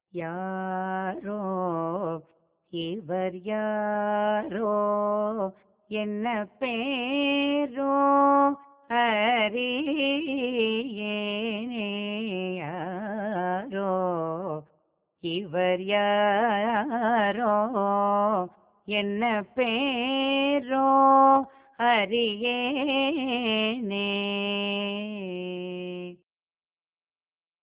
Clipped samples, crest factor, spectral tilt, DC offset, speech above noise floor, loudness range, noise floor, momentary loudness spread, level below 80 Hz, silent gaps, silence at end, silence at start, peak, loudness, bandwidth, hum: under 0.1%; 18 dB; -9 dB/octave; under 0.1%; over 64 dB; 8 LU; under -90 dBFS; 11 LU; -70 dBFS; none; 1.45 s; 0.15 s; -8 dBFS; -26 LUFS; 4 kHz; none